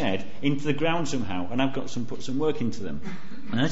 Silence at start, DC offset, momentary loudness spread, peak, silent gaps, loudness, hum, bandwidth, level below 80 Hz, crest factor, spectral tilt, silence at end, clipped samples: 0 s; 6%; 10 LU; -10 dBFS; none; -29 LUFS; none; 8 kHz; -54 dBFS; 16 dB; -5.5 dB/octave; 0 s; under 0.1%